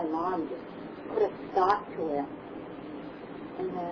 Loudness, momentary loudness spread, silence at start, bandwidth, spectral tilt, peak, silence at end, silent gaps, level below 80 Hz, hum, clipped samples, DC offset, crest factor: -33 LUFS; 15 LU; 0 s; 5.4 kHz; -7.5 dB/octave; -10 dBFS; 0 s; none; -64 dBFS; none; under 0.1%; under 0.1%; 22 dB